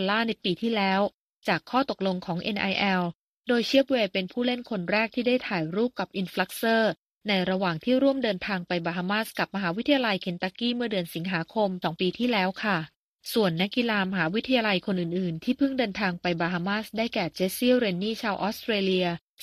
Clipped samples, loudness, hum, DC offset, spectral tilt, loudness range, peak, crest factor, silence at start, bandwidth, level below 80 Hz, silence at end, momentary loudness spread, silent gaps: under 0.1%; -27 LUFS; none; under 0.1%; -5.5 dB/octave; 1 LU; -8 dBFS; 18 dB; 0 s; 15 kHz; -64 dBFS; 0.25 s; 6 LU; 1.14-1.28 s, 1.35-1.40 s, 3.15-3.43 s, 6.98-7.21 s, 12.96-13.16 s